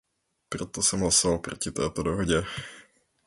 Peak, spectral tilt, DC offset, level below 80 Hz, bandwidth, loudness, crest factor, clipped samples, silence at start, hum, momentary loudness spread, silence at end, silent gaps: -8 dBFS; -3 dB/octave; under 0.1%; -46 dBFS; 12 kHz; -26 LUFS; 20 dB; under 0.1%; 0.5 s; none; 16 LU; 0.45 s; none